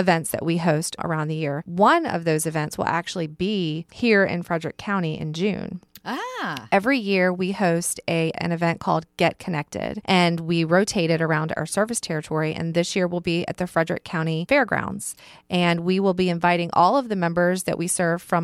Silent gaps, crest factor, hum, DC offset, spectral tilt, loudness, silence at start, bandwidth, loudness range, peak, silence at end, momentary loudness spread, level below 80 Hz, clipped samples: none; 16 dB; none; under 0.1%; -5 dB/octave; -23 LUFS; 0 s; 14.5 kHz; 3 LU; -6 dBFS; 0 s; 9 LU; -56 dBFS; under 0.1%